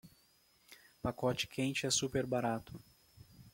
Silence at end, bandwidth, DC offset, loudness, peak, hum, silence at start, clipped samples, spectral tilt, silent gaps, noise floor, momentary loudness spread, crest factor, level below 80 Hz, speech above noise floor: 0.05 s; 16.5 kHz; under 0.1%; -36 LUFS; -20 dBFS; none; 0.05 s; under 0.1%; -3.5 dB/octave; none; -70 dBFS; 10 LU; 18 dB; -64 dBFS; 34 dB